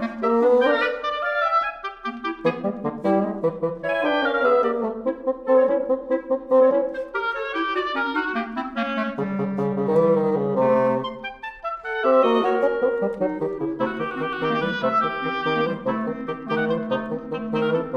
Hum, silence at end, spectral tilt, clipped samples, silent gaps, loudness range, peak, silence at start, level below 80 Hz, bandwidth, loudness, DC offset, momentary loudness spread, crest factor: none; 0 s; -7.5 dB/octave; under 0.1%; none; 3 LU; -6 dBFS; 0 s; -56 dBFS; 6.6 kHz; -23 LUFS; under 0.1%; 9 LU; 16 dB